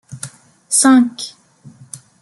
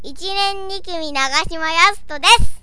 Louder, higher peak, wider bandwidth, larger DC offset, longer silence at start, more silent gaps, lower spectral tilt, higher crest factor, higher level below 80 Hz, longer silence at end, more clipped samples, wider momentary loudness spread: first, -12 LUFS vs -16 LUFS; about the same, 0 dBFS vs 0 dBFS; about the same, 12 kHz vs 11 kHz; second, under 0.1% vs 5%; about the same, 0.1 s vs 0.05 s; neither; about the same, -2.5 dB/octave vs -1.5 dB/octave; about the same, 18 dB vs 16 dB; second, -64 dBFS vs -30 dBFS; first, 0.25 s vs 0 s; neither; first, 25 LU vs 13 LU